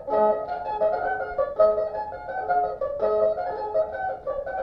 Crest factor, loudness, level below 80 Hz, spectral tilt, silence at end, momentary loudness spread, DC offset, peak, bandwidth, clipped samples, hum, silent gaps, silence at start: 16 dB; -25 LUFS; -52 dBFS; -7.5 dB/octave; 0 s; 9 LU; under 0.1%; -8 dBFS; 5.4 kHz; under 0.1%; none; none; 0 s